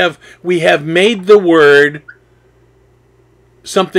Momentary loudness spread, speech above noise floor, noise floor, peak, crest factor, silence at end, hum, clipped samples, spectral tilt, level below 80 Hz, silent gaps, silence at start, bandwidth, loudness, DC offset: 11 LU; 39 dB; -50 dBFS; 0 dBFS; 12 dB; 0 s; none; 0.4%; -4.5 dB/octave; -56 dBFS; none; 0 s; 12.5 kHz; -10 LUFS; under 0.1%